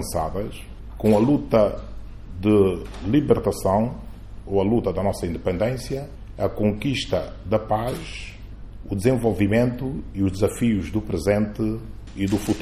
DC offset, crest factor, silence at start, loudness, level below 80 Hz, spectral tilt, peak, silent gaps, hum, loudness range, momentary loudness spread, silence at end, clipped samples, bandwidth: under 0.1%; 18 dB; 0 s; -23 LUFS; -38 dBFS; -7 dB/octave; -4 dBFS; none; none; 4 LU; 19 LU; 0 s; under 0.1%; 15 kHz